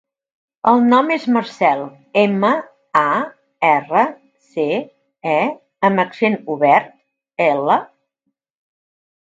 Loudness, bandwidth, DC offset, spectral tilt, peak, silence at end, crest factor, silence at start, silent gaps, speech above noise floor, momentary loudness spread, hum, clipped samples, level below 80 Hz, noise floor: -17 LUFS; 7.6 kHz; under 0.1%; -7 dB/octave; 0 dBFS; 1.5 s; 18 dB; 0.65 s; none; 58 dB; 9 LU; none; under 0.1%; -70 dBFS; -74 dBFS